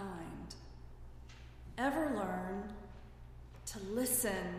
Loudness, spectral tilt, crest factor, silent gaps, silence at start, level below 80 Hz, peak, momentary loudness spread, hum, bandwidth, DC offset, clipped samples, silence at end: -38 LUFS; -4 dB/octave; 20 dB; none; 0 s; -54 dBFS; -20 dBFS; 22 LU; 60 Hz at -55 dBFS; 15.5 kHz; under 0.1%; under 0.1%; 0 s